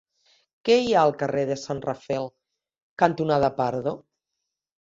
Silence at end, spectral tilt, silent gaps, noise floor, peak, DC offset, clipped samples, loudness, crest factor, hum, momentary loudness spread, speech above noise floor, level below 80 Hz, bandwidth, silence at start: 0.85 s; -6 dB/octave; 2.82-2.97 s; -83 dBFS; -2 dBFS; under 0.1%; under 0.1%; -24 LUFS; 22 dB; none; 11 LU; 60 dB; -60 dBFS; 7.8 kHz; 0.65 s